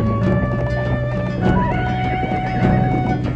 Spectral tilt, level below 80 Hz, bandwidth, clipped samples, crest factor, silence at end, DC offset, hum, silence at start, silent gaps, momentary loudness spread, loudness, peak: -9 dB/octave; -28 dBFS; 7.2 kHz; under 0.1%; 16 dB; 0 s; under 0.1%; none; 0 s; none; 4 LU; -19 LUFS; -2 dBFS